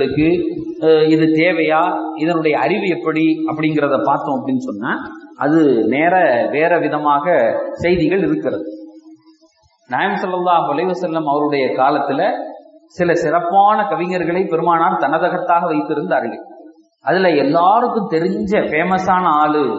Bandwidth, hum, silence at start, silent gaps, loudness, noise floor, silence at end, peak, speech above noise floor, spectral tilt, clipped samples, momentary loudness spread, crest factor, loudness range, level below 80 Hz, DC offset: 7.8 kHz; none; 0 s; none; -16 LUFS; -55 dBFS; 0 s; -2 dBFS; 39 dB; -7 dB/octave; under 0.1%; 8 LU; 14 dB; 3 LU; -52 dBFS; under 0.1%